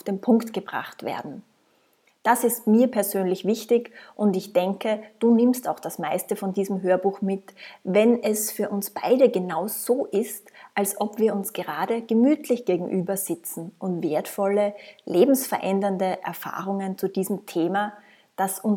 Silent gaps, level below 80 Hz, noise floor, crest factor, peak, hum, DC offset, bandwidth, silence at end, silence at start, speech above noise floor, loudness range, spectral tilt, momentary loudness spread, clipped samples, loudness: none; -80 dBFS; -64 dBFS; 18 dB; -6 dBFS; none; under 0.1%; 18.5 kHz; 0 s; 0.05 s; 41 dB; 2 LU; -5.5 dB/octave; 12 LU; under 0.1%; -24 LUFS